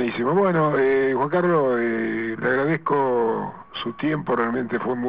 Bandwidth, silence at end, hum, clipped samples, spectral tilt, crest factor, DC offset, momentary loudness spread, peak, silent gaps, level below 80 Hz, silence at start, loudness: 5.2 kHz; 0 s; none; under 0.1%; -5 dB/octave; 14 dB; 0.2%; 7 LU; -8 dBFS; none; -60 dBFS; 0 s; -22 LUFS